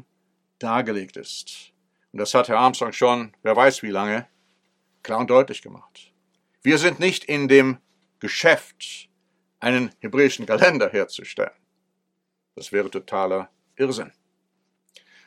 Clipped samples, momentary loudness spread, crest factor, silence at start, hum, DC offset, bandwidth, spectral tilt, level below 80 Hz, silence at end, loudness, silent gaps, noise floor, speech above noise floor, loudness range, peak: under 0.1%; 18 LU; 22 dB; 0.6 s; none; under 0.1%; 14 kHz; -4 dB/octave; -78 dBFS; 1.2 s; -21 LUFS; none; -77 dBFS; 56 dB; 7 LU; 0 dBFS